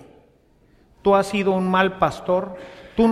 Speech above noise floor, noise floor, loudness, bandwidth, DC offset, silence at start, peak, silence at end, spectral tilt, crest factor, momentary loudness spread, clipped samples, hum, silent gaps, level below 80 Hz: 37 dB; -57 dBFS; -21 LUFS; 13 kHz; under 0.1%; 1.05 s; -2 dBFS; 0 s; -6.5 dB/octave; 18 dB; 11 LU; under 0.1%; none; none; -48 dBFS